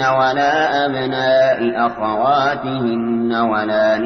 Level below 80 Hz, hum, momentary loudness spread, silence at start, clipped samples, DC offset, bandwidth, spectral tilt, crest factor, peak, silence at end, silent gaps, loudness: -52 dBFS; none; 5 LU; 0 s; under 0.1%; under 0.1%; 6.4 kHz; -6 dB/octave; 12 dB; -4 dBFS; 0 s; none; -16 LUFS